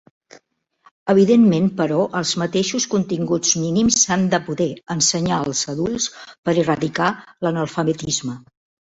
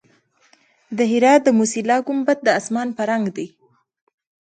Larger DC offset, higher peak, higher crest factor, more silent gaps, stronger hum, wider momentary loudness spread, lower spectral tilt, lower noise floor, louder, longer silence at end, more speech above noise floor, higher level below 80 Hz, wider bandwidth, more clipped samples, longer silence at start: neither; about the same, -2 dBFS vs -2 dBFS; about the same, 16 dB vs 18 dB; first, 6.38-6.43 s vs none; neither; second, 9 LU vs 13 LU; about the same, -4 dB/octave vs -4.5 dB/octave; about the same, -59 dBFS vs -59 dBFS; about the same, -19 LUFS vs -18 LUFS; second, 0.5 s vs 0.95 s; about the same, 40 dB vs 41 dB; first, -54 dBFS vs -70 dBFS; second, 8 kHz vs 9.4 kHz; neither; first, 1.05 s vs 0.9 s